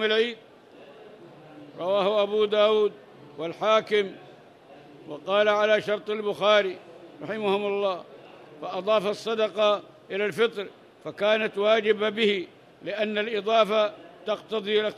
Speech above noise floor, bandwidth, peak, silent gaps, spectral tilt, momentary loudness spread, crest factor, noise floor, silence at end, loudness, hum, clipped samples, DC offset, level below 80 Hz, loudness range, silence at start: 25 dB; 12 kHz; -8 dBFS; none; -4.5 dB/octave; 17 LU; 18 dB; -50 dBFS; 0 s; -25 LUFS; none; under 0.1%; under 0.1%; -78 dBFS; 2 LU; 0 s